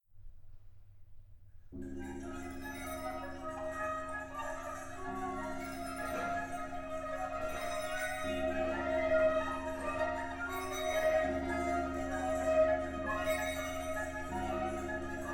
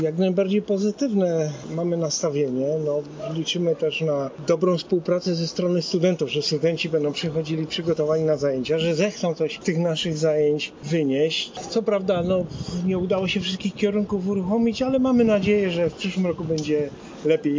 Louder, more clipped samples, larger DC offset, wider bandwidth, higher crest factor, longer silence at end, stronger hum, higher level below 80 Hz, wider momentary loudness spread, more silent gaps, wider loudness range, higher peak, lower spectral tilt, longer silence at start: second, -37 LUFS vs -23 LUFS; neither; neither; first, 19 kHz vs 7.6 kHz; about the same, 18 dB vs 16 dB; about the same, 0 s vs 0 s; neither; about the same, -50 dBFS vs -54 dBFS; first, 12 LU vs 5 LU; neither; first, 8 LU vs 2 LU; second, -20 dBFS vs -8 dBFS; about the same, -4.5 dB/octave vs -5.5 dB/octave; first, 0.15 s vs 0 s